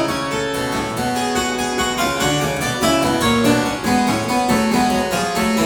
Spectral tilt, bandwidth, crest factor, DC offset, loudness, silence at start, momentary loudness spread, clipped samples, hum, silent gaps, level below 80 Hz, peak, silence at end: -4 dB/octave; 19.5 kHz; 14 dB; under 0.1%; -18 LUFS; 0 s; 5 LU; under 0.1%; none; none; -40 dBFS; -4 dBFS; 0 s